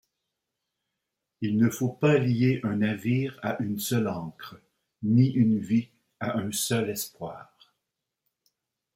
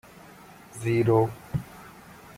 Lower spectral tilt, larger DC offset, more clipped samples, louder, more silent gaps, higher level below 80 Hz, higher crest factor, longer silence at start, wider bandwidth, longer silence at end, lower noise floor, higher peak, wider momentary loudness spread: second, -6 dB/octave vs -7.5 dB/octave; neither; neither; about the same, -26 LUFS vs -26 LUFS; neither; second, -66 dBFS vs -56 dBFS; about the same, 18 dB vs 20 dB; first, 1.4 s vs 0.75 s; about the same, 16.5 kHz vs 16 kHz; first, 1.55 s vs 0.05 s; first, -84 dBFS vs -49 dBFS; about the same, -10 dBFS vs -8 dBFS; second, 17 LU vs 26 LU